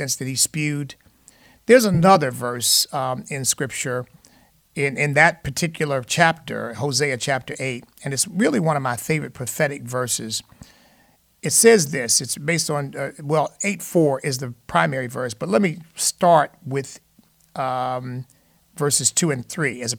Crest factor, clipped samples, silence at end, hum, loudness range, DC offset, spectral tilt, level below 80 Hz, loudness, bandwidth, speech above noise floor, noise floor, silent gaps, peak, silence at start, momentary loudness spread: 20 dB; under 0.1%; 0 s; none; 4 LU; under 0.1%; -3.5 dB/octave; -58 dBFS; -20 LUFS; 19 kHz; 37 dB; -58 dBFS; none; -2 dBFS; 0 s; 13 LU